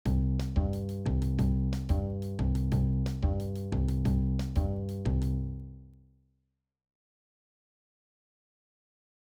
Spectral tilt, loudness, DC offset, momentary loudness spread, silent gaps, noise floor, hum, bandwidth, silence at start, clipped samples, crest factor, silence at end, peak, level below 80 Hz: -8.5 dB/octave; -31 LUFS; under 0.1%; 5 LU; none; -80 dBFS; none; 12.5 kHz; 0.05 s; under 0.1%; 14 dB; 3.4 s; -16 dBFS; -36 dBFS